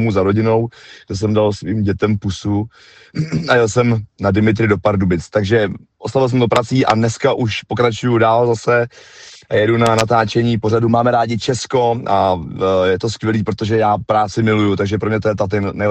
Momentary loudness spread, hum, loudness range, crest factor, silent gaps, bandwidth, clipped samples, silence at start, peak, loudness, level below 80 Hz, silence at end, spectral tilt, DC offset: 6 LU; none; 2 LU; 16 dB; none; 9 kHz; under 0.1%; 0 s; 0 dBFS; -16 LUFS; -46 dBFS; 0 s; -6.5 dB/octave; under 0.1%